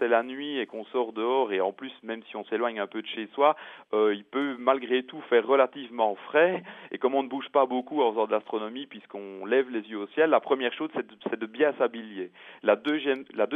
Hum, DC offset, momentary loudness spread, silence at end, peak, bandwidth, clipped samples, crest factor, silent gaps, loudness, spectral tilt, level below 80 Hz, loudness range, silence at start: none; under 0.1%; 13 LU; 0 s; -8 dBFS; 3.9 kHz; under 0.1%; 20 dB; none; -27 LUFS; -7 dB/octave; -88 dBFS; 3 LU; 0 s